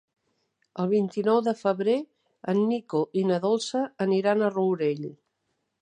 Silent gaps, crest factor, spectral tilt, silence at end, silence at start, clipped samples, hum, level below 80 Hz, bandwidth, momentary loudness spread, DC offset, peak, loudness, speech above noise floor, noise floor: none; 16 dB; -6.5 dB/octave; 0.65 s; 0.75 s; under 0.1%; none; -78 dBFS; 9.8 kHz; 9 LU; under 0.1%; -10 dBFS; -26 LUFS; 53 dB; -77 dBFS